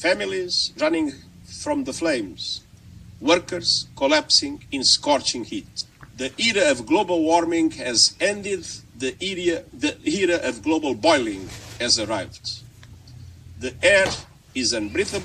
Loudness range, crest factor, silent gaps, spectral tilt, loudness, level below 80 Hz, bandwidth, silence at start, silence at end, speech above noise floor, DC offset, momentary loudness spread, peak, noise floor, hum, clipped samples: 4 LU; 20 dB; none; -2.5 dB/octave; -21 LUFS; -52 dBFS; 12.5 kHz; 0 s; 0 s; 22 dB; under 0.1%; 15 LU; -2 dBFS; -44 dBFS; none; under 0.1%